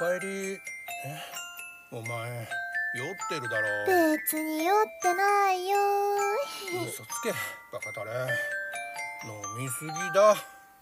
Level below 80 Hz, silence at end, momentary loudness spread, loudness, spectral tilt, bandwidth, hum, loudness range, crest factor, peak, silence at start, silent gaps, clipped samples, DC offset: -76 dBFS; 0.15 s; 14 LU; -29 LUFS; -3.5 dB/octave; 16 kHz; none; 7 LU; 20 dB; -10 dBFS; 0 s; none; under 0.1%; under 0.1%